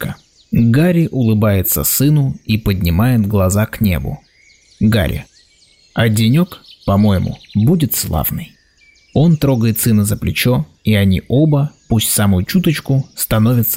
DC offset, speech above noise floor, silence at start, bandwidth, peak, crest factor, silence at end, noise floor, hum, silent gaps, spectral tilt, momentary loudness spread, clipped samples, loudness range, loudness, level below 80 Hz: under 0.1%; 37 dB; 0 s; 16.5 kHz; -4 dBFS; 10 dB; 0 s; -51 dBFS; none; none; -6 dB/octave; 8 LU; under 0.1%; 3 LU; -14 LUFS; -36 dBFS